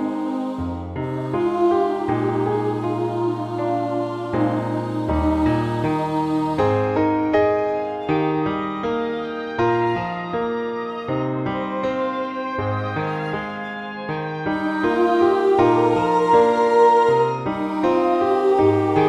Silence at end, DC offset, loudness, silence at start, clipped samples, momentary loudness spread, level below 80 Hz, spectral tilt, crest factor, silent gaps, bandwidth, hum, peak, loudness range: 0 s; under 0.1%; -21 LUFS; 0 s; under 0.1%; 10 LU; -44 dBFS; -8 dB/octave; 16 dB; none; 10.5 kHz; none; -4 dBFS; 7 LU